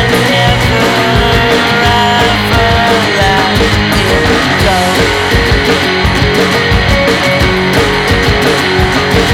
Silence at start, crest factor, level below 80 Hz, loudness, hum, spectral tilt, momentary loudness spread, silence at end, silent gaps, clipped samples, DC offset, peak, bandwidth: 0 s; 8 dB; -20 dBFS; -9 LUFS; none; -4.5 dB/octave; 1 LU; 0 s; none; under 0.1%; under 0.1%; 0 dBFS; 19.5 kHz